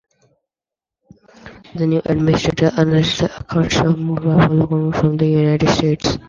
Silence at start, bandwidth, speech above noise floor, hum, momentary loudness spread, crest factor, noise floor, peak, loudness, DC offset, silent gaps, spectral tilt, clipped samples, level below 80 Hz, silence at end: 1.45 s; 7.4 kHz; 73 dB; none; 5 LU; 16 dB; -88 dBFS; -2 dBFS; -16 LUFS; under 0.1%; none; -6.5 dB/octave; under 0.1%; -40 dBFS; 0.1 s